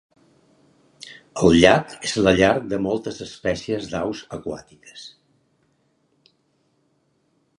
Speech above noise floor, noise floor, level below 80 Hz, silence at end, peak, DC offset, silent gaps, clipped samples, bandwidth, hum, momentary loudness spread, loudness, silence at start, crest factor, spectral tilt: 46 dB; -66 dBFS; -46 dBFS; 2.5 s; 0 dBFS; under 0.1%; none; under 0.1%; 11.5 kHz; none; 26 LU; -20 LUFS; 1.05 s; 24 dB; -5 dB/octave